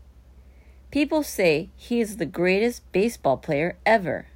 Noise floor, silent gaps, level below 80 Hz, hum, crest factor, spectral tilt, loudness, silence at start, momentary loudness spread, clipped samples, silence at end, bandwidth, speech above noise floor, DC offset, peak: -50 dBFS; none; -50 dBFS; none; 18 dB; -5.5 dB/octave; -24 LUFS; 0.35 s; 6 LU; under 0.1%; 0.1 s; 16 kHz; 26 dB; under 0.1%; -6 dBFS